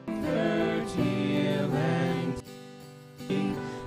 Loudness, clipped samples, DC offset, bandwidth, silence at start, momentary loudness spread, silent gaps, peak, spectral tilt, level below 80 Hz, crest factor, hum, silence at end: -29 LUFS; under 0.1%; under 0.1%; 15.5 kHz; 0 s; 18 LU; none; -14 dBFS; -7 dB/octave; -56 dBFS; 16 dB; none; 0 s